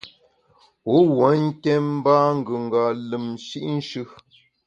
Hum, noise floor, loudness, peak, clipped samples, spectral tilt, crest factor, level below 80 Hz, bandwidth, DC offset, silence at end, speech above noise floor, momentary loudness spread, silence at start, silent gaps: none; -59 dBFS; -21 LUFS; -4 dBFS; under 0.1%; -7.5 dB/octave; 18 dB; -66 dBFS; 8.6 kHz; under 0.1%; 0.6 s; 39 dB; 14 LU; 0.05 s; none